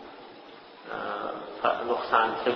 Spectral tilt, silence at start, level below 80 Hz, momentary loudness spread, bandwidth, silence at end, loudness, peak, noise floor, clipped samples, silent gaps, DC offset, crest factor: -6 dB/octave; 0 s; -66 dBFS; 22 LU; 6.2 kHz; 0 s; -28 LUFS; -6 dBFS; -48 dBFS; under 0.1%; none; under 0.1%; 24 dB